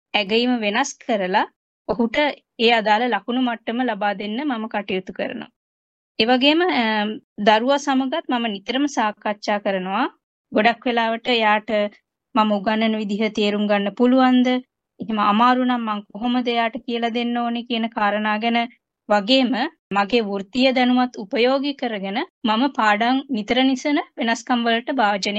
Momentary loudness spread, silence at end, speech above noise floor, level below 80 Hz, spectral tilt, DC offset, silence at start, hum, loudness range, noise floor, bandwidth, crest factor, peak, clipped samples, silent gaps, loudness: 9 LU; 0 s; over 70 dB; -62 dBFS; -4.5 dB/octave; under 0.1%; 0.15 s; none; 3 LU; under -90 dBFS; 8.2 kHz; 18 dB; -2 dBFS; under 0.1%; 1.56-1.85 s, 5.56-6.15 s, 7.24-7.36 s, 10.23-10.44 s, 19.79-19.91 s, 22.30-22.41 s; -20 LUFS